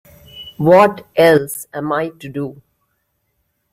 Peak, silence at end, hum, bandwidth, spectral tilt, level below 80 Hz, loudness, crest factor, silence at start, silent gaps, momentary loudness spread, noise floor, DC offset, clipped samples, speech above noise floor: 0 dBFS; 1.2 s; none; 16 kHz; -5.5 dB/octave; -54 dBFS; -15 LUFS; 16 dB; 0.35 s; none; 17 LU; -68 dBFS; under 0.1%; under 0.1%; 54 dB